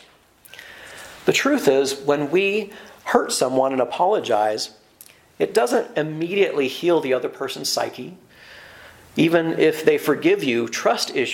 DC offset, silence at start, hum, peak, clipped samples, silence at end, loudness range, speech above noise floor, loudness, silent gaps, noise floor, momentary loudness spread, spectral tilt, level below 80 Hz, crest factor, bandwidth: under 0.1%; 0.55 s; none; 0 dBFS; under 0.1%; 0 s; 3 LU; 31 dB; -20 LUFS; none; -51 dBFS; 17 LU; -4 dB/octave; -66 dBFS; 22 dB; 17 kHz